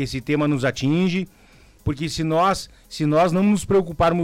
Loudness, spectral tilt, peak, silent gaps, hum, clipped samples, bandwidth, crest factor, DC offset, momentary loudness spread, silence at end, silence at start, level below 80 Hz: -21 LUFS; -6 dB/octave; -10 dBFS; none; none; under 0.1%; 15.5 kHz; 12 dB; under 0.1%; 10 LU; 0 s; 0 s; -42 dBFS